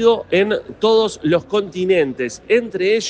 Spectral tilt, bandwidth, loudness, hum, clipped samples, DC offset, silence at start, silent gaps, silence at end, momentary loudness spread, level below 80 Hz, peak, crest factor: -4.5 dB/octave; 9.2 kHz; -18 LUFS; none; under 0.1%; under 0.1%; 0 s; none; 0 s; 5 LU; -54 dBFS; -2 dBFS; 14 dB